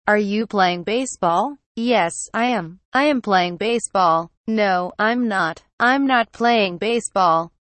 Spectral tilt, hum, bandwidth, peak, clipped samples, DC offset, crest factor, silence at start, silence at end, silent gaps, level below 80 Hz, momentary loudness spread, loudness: -4 dB/octave; none; 8.8 kHz; -4 dBFS; under 0.1%; under 0.1%; 16 dB; 0.05 s; 0.2 s; 1.66-1.75 s, 2.85-2.92 s, 4.37-4.44 s, 5.73-5.78 s; -60 dBFS; 5 LU; -19 LUFS